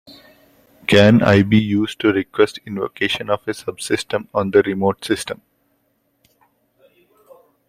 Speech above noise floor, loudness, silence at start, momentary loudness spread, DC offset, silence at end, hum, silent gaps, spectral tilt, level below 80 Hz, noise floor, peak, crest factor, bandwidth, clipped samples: 49 dB; -17 LUFS; 0.1 s; 14 LU; under 0.1%; 2.35 s; none; none; -6 dB/octave; -52 dBFS; -65 dBFS; 0 dBFS; 18 dB; 15 kHz; under 0.1%